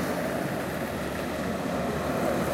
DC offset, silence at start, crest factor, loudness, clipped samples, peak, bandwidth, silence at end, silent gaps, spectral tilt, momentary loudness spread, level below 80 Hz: under 0.1%; 0 s; 14 dB; -30 LUFS; under 0.1%; -16 dBFS; 17 kHz; 0 s; none; -5.5 dB/octave; 4 LU; -46 dBFS